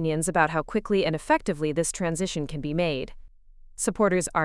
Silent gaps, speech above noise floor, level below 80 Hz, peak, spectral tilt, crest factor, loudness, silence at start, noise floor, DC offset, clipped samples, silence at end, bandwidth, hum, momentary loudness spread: none; 24 dB; -46 dBFS; -6 dBFS; -4.5 dB/octave; 20 dB; -26 LUFS; 0 s; -49 dBFS; under 0.1%; under 0.1%; 0 s; 12 kHz; none; 7 LU